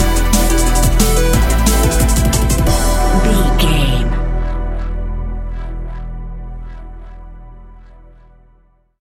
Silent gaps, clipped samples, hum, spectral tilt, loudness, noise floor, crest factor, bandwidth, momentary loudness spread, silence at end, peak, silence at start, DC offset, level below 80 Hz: none; under 0.1%; none; -4.5 dB/octave; -15 LUFS; -52 dBFS; 14 dB; 17 kHz; 18 LU; 1.3 s; 0 dBFS; 0 s; under 0.1%; -16 dBFS